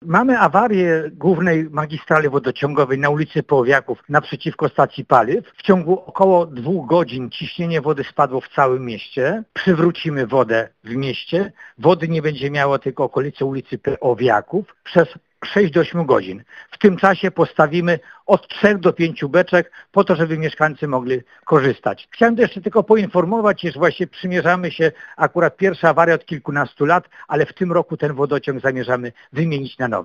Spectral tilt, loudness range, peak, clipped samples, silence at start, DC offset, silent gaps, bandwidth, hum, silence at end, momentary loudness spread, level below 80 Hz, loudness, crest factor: -7.5 dB/octave; 3 LU; 0 dBFS; under 0.1%; 0.05 s; under 0.1%; none; 7.6 kHz; none; 0 s; 8 LU; -56 dBFS; -18 LUFS; 18 dB